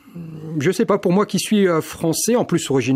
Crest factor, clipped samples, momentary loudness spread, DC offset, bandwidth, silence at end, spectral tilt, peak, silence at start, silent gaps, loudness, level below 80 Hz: 14 dB; under 0.1%; 8 LU; under 0.1%; 16 kHz; 0 s; -5 dB/octave; -4 dBFS; 0.15 s; none; -19 LUFS; -56 dBFS